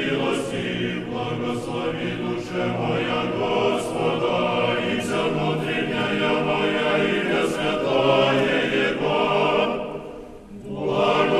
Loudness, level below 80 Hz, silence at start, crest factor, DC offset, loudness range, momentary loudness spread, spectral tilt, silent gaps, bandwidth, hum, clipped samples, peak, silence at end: -22 LUFS; -50 dBFS; 0 s; 16 dB; under 0.1%; 4 LU; 8 LU; -5.5 dB/octave; none; 13 kHz; none; under 0.1%; -6 dBFS; 0 s